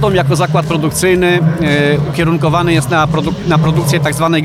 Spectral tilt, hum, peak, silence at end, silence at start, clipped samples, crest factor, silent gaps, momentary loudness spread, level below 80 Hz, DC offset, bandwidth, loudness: -5.5 dB/octave; none; 0 dBFS; 0 s; 0 s; under 0.1%; 12 dB; none; 3 LU; -34 dBFS; under 0.1%; 15 kHz; -12 LUFS